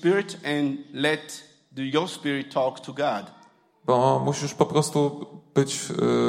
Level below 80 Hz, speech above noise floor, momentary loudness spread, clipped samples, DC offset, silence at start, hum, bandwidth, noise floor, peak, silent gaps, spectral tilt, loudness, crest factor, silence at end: -70 dBFS; 31 dB; 12 LU; under 0.1%; under 0.1%; 0 s; none; 16 kHz; -56 dBFS; -4 dBFS; none; -5 dB/octave; -25 LUFS; 20 dB; 0 s